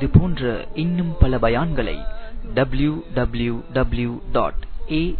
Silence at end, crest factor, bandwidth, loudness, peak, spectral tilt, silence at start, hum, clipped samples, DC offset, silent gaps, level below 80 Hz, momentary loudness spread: 0 s; 20 dB; 4.5 kHz; -22 LUFS; 0 dBFS; -11 dB/octave; 0 s; none; under 0.1%; under 0.1%; none; -26 dBFS; 9 LU